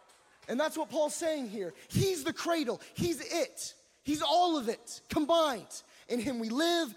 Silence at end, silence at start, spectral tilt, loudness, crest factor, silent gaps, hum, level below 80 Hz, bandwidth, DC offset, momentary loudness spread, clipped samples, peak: 0 s; 0.5 s; -4 dB/octave; -32 LUFS; 16 dB; none; none; -64 dBFS; 17 kHz; under 0.1%; 14 LU; under 0.1%; -16 dBFS